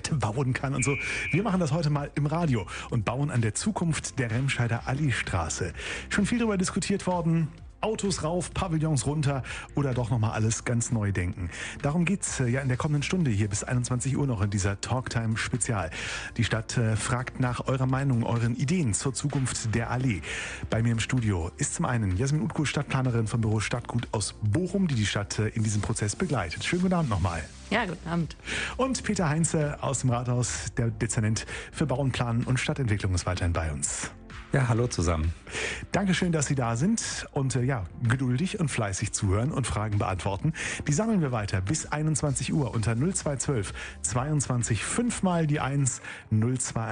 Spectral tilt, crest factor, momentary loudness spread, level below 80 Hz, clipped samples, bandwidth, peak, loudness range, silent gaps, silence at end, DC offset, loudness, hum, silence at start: -5 dB/octave; 16 dB; 5 LU; -46 dBFS; under 0.1%; 10 kHz; -10 dBFS; 1 LU; none; 0 s; under 0.1%; -28 LUFS; none; 0.05 s